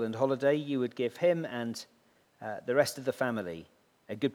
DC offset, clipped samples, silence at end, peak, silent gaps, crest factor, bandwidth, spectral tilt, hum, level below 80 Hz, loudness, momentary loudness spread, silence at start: under 0.1%; under 0.1%; 0 s; -12 dBFS; none; 20 dB; 18 kHz; -5.5 dB/octave; none; -76 dBFS; -31 LUFS; 15 LU; 0 s